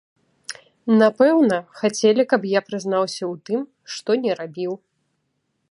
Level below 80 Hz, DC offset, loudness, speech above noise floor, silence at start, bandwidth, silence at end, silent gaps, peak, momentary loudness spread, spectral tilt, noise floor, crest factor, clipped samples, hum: -72 dBFS; under 0.1%; -20 LUFS; 53 dB; 0.5 s; 11 kHz; 0.95 s; none; -2 dBFS; 18 LU; -5 dB/octave; -72 dBFS; 18 dB; under 0.1%; none